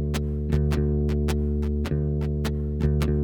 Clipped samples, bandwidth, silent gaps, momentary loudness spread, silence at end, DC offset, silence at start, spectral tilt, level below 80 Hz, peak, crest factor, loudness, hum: under 0.1%; 16.5 kHz; none; 4 LU; 0 s; under 0.1%; 0 s; -8 dB/octave; -28 dBFS; -10 dBFS; 12 dB; -25 LUFS; none